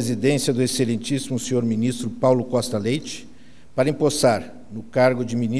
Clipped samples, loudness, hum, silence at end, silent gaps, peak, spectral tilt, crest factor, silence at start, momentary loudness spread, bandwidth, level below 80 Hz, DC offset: under 0.1%; -22 LUFS; none; 0 s; none; -4 dBFS; -5.5 dB/octave; 18 dB; 0 s; 8 LU; 11 kHz; -54 dBFS; 1%